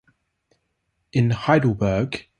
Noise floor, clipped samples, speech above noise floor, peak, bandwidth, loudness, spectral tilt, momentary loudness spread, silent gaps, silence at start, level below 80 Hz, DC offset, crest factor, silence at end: -73 dBFS; under 0.1%; 53 dB; -2 dBFS; 9.8 kHz; -21 LUFS; -7.5 dB/octave; 6 LU; none; 1.15 s; -46 dBFS; under 0.1%; 20 dB; 0.2 s